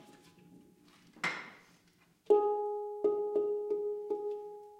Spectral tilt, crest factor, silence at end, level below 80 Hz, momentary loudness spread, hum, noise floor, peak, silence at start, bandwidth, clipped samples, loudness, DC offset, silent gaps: -4.5 dB/octave; 22 dB; 0 s; -84 dBFS; 12 LU; none; -68 dBFS; -14 dBFS; 0 s; 9.2 kHz; under 0.1%; -34 LUFS; under 0.1%; none